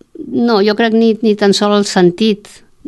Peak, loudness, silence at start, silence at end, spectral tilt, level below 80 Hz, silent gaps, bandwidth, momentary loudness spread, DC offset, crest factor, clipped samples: 0 dBFS; -12 LUFS; 0.2 s; 0.5 s; -5 dB/octave; -56 dBFS; none; 12 kHz; 5 LU; under 0.1%; 12 dB; under 0.1%